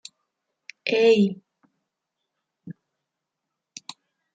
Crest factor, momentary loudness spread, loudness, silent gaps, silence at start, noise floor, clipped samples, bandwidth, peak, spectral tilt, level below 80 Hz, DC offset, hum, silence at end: 20 dB; 26 LU; -21 LUFS; none; 0.85 s; -83 dBFS; under 0.1%; 9 kHz; -8 dBFS; -5.5 dB/octave; -76 dBFS; under 0.1%; none; 1.6 s